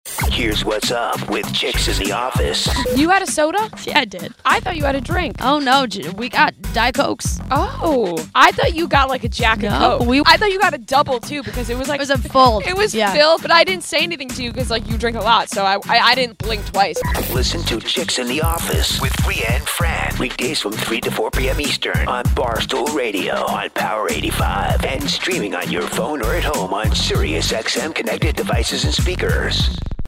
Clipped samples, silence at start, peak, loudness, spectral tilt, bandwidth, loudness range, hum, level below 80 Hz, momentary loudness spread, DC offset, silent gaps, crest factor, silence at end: under 0.1%; 0.05 s; 0 dBFS; -17 LUFS; -4 dB/octave; 16.5 kHz; 4 LU; none; -28 dBFS; 8 LU; under 0.1%; none; 18 dB; 0 s